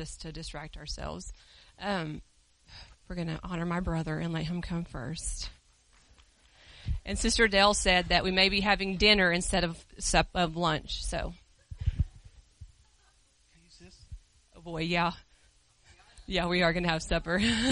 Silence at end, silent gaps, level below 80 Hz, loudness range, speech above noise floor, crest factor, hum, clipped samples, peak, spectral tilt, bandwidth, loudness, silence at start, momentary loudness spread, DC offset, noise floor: 0 s; none; -42 dBFS; 14 LU; 36 dB; 22 dB; none; under 0.1%; -8 dBFS; -3.5 dB/octave; 10.5 kHz; -29 LUFS; 0 s; 18 LU; under 0.1%; -65 dBFS